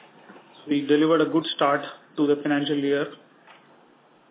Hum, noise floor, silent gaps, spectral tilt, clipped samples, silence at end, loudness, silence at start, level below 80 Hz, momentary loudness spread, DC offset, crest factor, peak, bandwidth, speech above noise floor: none; -57 dBFS; none; -9.5 dB/octave; under 0.1%; 1.15 s; -23 LUFS; 0.3 s; -78 dBFS; 10 LU; under 0.1%; 16 dB; -8 dBFS; 4 kHz; 34 dB